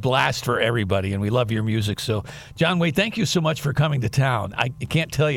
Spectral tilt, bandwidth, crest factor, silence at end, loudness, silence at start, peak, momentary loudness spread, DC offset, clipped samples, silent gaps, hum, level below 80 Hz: -5.5 dB/octave; 17 kHz; 16 dB; 0 s; -22 LUFS; 0 s; -6 dBFS; 5 LU; under 0.1%; under 0.1%; none; none; -48 dBFS